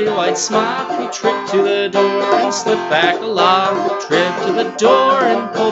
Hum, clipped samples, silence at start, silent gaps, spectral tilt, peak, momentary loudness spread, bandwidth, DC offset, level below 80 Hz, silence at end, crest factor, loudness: none; under 0.1%; 0 s; none; -3.5 dB/octave; 0 dBFS; 6 LU; 8.2 kHz; under 0.1%; -62 dBFS; 0 s; 14 dB; -15 LUFS